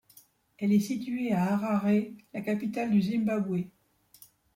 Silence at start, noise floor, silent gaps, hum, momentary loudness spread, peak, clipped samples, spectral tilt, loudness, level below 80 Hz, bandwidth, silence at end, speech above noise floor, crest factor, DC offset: 0.6 s; -60 dBFS; none; none; 8 LU; -16 dBFS; under 0.1%; -7.5 dB/octave; -29 LUFS; -70 dBFS; 16 kHz; 0.85 s; 32 dB; 14 dB; under 0.1%